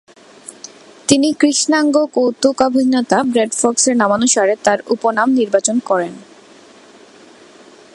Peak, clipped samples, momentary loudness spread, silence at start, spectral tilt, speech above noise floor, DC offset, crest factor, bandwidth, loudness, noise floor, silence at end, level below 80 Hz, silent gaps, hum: 0 dBFS; under 0.1%; 12 LU; 0.5 s; -3 dB/octave; 29 dB; under 0.1%; 16 dB; 11.5 kHz; -14 LUFS; -43 dBFS; 1.7 s; -60 dBFS; none; none